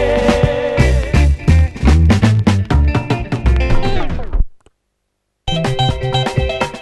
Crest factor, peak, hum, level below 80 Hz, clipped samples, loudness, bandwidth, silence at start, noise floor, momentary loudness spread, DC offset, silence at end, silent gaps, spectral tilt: 14 dB; 0 dBFS; none; -18 dBFS; under 0.1%; -15 LUFS; 12 kHz; 0 s; -70 dBFS; 10 LU; under 0.1%; 0 s; none; -6.5 dB/octave